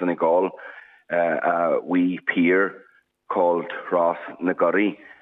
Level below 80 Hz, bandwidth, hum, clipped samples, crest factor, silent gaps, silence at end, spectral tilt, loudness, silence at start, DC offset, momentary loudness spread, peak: -82 dBFS; 3.9 kHz; none; under 0.1%; 14 dB; none; 0.15 s; -8.5 dB/octave; -22 LUFS; 0 s; under 0.1%; 8 LU; -8 dBFS